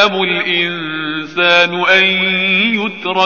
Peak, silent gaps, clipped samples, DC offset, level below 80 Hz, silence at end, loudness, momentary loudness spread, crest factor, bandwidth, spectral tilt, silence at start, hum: 0 dBFS; none; under 0.1%; 0.5%; -60 dBFS; 0 s; -12 LUFS; 10 LU; 14 dB; 7 kHz; -1 dB/octave; 0 s; none